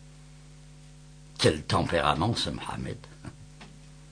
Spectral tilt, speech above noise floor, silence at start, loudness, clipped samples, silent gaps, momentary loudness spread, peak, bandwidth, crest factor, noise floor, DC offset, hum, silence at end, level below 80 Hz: -5 dB/octave; 22 dB; 0 s; -28 LUFS; under 0.1%; none; 24 LU; -8 dBFS; 10 kHz; 22 dB; -50 dBFS; under 0.1%; none; 0 s; -48 dBFS